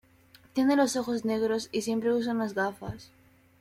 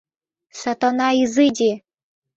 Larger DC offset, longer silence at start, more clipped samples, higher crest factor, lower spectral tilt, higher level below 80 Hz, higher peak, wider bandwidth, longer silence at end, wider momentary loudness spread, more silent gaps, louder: neither; about the same, 0.55 s vs 0.55 s; neither; about the same, 16 dB vs 16 dB; about the same, -4.5 dB/octave vs -3.5 dB/octave; about the same, -62 dBFS vs -62 dBFS; second, -14 dBFS vs -4 dBFS; first, 15.5 kHz vs 8 kHz; about the same, 0.55 s vs 0.6 s; about the same, 12 LU vs 12 LU; neither; second, -28 LUFS vs -19 LUFS